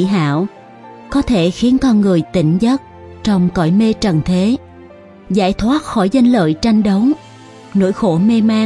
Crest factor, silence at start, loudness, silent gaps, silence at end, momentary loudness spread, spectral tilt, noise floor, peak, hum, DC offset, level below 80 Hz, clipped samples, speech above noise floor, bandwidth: 12 dB; 0 s; -14 LUFS; none; 0 s; 8 LU; -7 dB/octave; -38 dBFS; -2 dBFS; none; under 0.1%; -38 dBFS; under 0.1%; 25 dB; 11.5 kHz